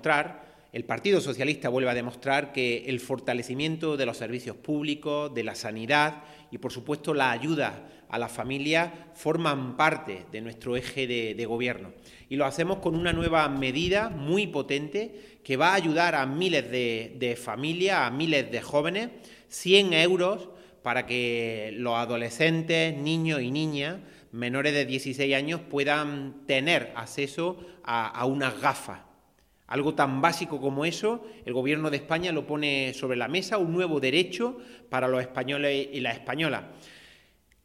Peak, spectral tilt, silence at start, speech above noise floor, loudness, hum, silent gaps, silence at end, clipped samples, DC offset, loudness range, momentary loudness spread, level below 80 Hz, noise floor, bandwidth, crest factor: -6 dBFS; -5 dB/octave; 0 s; 36 dB; -27 LUFS; none; none; 0.65 s; under 0.1%; under 0.1%; 4 LU; 11 LU; -56 dBFS; -64 dBFS; 16 kHz; 22 dB